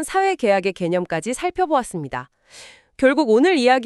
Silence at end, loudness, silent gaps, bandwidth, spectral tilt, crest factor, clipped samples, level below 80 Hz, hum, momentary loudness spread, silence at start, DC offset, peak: 0 s; -19 LUFS; none; 13 kHz; -4.5 dB/octave; 16 dB; under 0.1%; -52 dBFS; none; 13 LU; 0 s; under 0.1%; -4 dBFS